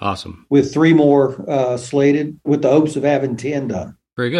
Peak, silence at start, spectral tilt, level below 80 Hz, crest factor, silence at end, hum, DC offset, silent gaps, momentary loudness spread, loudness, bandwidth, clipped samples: -2 dBFS; 0 s; -7 dB/octave; -56 dBFS; 14 dB; 0 s; none; under 0.1%; none; 12 LU; -16 LUFS; 10.5 kHz; under 0.1%